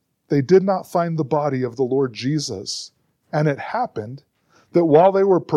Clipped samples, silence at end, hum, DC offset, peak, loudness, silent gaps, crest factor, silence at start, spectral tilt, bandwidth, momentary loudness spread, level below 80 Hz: under 0.1%; 0 s; none; under 0.1%; -2 dBFS; -20 LUFS; none; 18 dB; 0.3 s; -6.5 dB/octave; 12.5 kHz; 13 LU; -66 dBFS